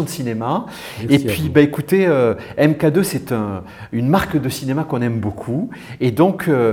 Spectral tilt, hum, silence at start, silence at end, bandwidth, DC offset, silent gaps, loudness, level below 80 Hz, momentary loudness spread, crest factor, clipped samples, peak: -6.5 dB/octave; none; 0 s; 0 s; over 20 kHz; under 0.1%; none; -18 LUFS; -48 dBFS; 9 LU; 18 dB; under 0.1%; 0 dBFS